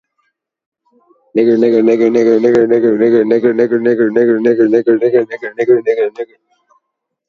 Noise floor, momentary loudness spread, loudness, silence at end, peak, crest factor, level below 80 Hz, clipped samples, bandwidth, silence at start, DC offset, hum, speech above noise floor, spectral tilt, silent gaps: -73 dBFS; 7 LU; -12 LUFS; 1.05 s; 0 dBFS; 12 dB; -60 dBFS; under 0.1%; 6.8 kHz; 1.35 s; under 0.1%; none; 62 dB; -7.5 dB/octave; none